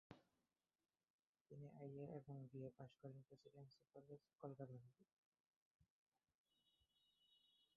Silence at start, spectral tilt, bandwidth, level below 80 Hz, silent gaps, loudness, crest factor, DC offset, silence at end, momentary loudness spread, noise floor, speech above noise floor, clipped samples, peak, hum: 0.1 s; -8 dB/octave; 4.9 kHz; under -90 dBFS; 1.10-1.33 s, 1.41-1.45 s, 5.13-5.32 s, 5.40-5.79 s, 5.90-6.12 s, 6.35-6.44 s; -60 LUFS; 22 dB; under 0.1%; 0.1 s; 10 LU; under -90 dBFS; over 31 dB; under 0.1%; -40 dBFS; none